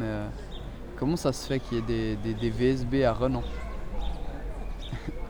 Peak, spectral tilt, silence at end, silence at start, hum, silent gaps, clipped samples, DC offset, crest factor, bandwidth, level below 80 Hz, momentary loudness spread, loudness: -12 dBFS; -6.5 dB/octave; 0 s; 0 s; none; none; under 0.1%; under 0.1%; 16 dB; over 20 kHz; -36 dBFS; 14 LU; -30 LUFS